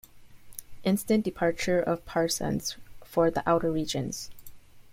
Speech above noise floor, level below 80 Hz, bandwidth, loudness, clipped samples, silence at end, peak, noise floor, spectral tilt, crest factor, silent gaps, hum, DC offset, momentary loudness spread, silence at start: 20 dB; -54 dBFS; 16.5 kHz; -28 LUFS; under 0.1%; 0 s; -12 dBFS; -47 dBFS; -5 dB/octave; 18 dB; none; none; under 0.1%; 18 LU; 0.15 s